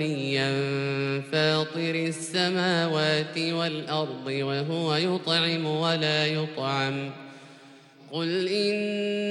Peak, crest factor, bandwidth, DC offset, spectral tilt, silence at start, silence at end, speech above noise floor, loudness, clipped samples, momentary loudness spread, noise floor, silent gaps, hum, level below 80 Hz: -10 dBFS; 18 dB; 12 kHz; under 0.1%; -5 dB/octave; 0 s; 0 s; 24 dB; -26 LUFS; under 0.1%; 6 LU; -51 dBFS; none; none; -76 dBFS